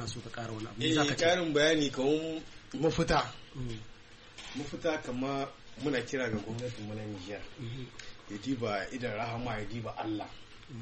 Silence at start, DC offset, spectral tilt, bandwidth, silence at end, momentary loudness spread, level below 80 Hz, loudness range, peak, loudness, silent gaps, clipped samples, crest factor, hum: 0 s; under 0.1%; -4.5 dB/octave; 8.4 kHz; 0 s; 17 LU; -52 dBFS; 8 LU; -16 dBFS; -33 LUFS; none; under 0.1%; 18 dB; none